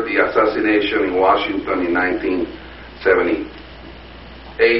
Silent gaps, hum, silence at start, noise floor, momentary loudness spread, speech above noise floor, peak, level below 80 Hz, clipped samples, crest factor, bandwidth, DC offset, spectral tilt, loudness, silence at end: none; none; 0 s; -37 dBFS; 22 LU; 20 dB; -2 dBFS; -42 dBFS; under 0.1%; 16 dB; 5.8 kHz; 0.3%; -2.5 dB/octave; -18 LUFS; 0 s